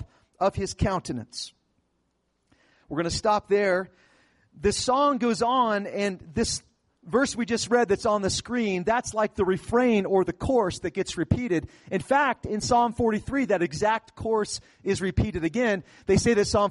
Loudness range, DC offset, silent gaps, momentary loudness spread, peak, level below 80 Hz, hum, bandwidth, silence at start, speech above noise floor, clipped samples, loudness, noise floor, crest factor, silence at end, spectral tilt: 4 LU; under 0.1%; none; 8 LU; -10 dBFS; -46 dBFS; none; 11.5 kHz; 0 s; 48 dB; under 0.1%; -25 LUFS; -73 dBFS; 16 dB; 0 s; -5 dB/octave